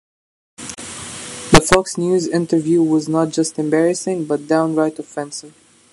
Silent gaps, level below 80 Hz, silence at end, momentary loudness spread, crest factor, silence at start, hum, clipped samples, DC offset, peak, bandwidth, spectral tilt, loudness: none; -40 dBFS; 0.45 s; 16 LU; 18 dB; 0.6 s; none; under 0.1%; under 0.1%; 0 dBFS; 13.5 kHz; -4.5 dB/octave; -17 LUFS